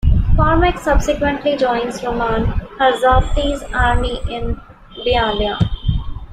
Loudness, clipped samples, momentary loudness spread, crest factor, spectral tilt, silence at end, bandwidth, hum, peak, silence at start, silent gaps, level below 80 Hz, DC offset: -17 LUFS; under 0.1%; 10 LU; 16 dB; -6 dB/octave; 0 s; 12.5 kHz; none; 0 dBFS; 0.05 s; none; -22 dBFS; under 0.1%